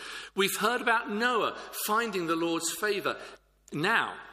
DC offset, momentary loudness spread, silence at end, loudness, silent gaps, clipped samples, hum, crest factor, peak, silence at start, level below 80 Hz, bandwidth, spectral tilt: under 0.1%; 8 LU; 0 s; -29 LUFS; none; under 0.1%; none; 20 dB; -10 dBFS; 0 s; -68 dBFS; 15.5 kHz; -2.5 dB/octave